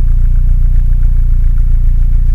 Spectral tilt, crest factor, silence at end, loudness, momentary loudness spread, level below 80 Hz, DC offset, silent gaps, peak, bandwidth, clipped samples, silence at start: -9.5 dB/octave; 6 dB; 0 s; -15 LUFS; 1 LU; -8 dBFS; under 0.1%; none; 0 dBFS; 1.4 kHz; under 0.1%; 0 s